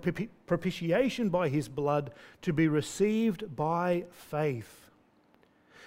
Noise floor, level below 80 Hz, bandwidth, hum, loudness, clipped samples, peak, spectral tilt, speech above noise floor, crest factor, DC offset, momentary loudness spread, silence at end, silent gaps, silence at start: -65 dBFS; -62 dBFS; 16 kHz; none; -31 LUFS; under 0.1%; -16 dBFS; -6.5 dB/octave; 35 dB; 16 dB; under 0.1%; 10 LU; 0 s; none; 0 s